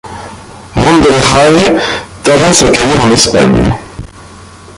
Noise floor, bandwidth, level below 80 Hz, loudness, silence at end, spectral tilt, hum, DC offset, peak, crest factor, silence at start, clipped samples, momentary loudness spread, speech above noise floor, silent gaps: -32 dBFS; 16 kHz; -28 dBFS; -8 LUFS; 0.05 s; -4 dB/octave; none; under 0.1%; 0 dBFS; 10 dB; 0.05 s; 0.1%; 20 LU; 25 dB; none